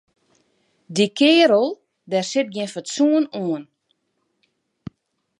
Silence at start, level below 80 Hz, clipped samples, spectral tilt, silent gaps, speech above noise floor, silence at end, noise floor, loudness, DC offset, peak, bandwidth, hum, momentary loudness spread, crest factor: 0.9 s; -68 dBFS; under 0.1%; -4.5 dB/octave; none; 53 dB; 1.75 s; -72 dBFS; -19 LUFS; under 0.1%; -4 dBFS; 11.5 kHz; none; 26 LU; 18 dB